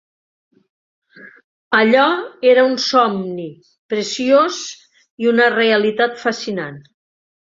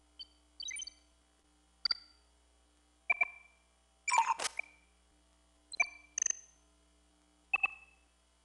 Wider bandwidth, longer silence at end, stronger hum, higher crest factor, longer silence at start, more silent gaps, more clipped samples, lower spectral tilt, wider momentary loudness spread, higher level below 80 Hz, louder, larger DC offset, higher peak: second, 7.6 kHz vs 11.5 kHz; about the same, 0.65 s vs 0.65 s; neither; second, 16 dB vs 24 dB; first, 1.2 s vs 0.2 s; first, 1.44-1.71 s, 3.78-3.89 s, 5.10-5.18 s vs none; neither; first, -4 dB/octave vs 2.5 dB/octave; second, 14 LU vs 20 LU; first, -66 dBFS vs -72 dBFS; first, -16 LUFS vs -35 LUFS; neither; first, -2 dBFS vs -16 dBFS